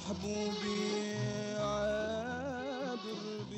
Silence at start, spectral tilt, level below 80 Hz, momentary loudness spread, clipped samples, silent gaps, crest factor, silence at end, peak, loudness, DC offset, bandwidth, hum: 0 s; -5 dB/octave; -60 dBFS; 5 LU; under 0.1%; none; 12 dB; 0 s; -24 dBFS; -37 LUFS; under 0.1%; 8.8 kHz; none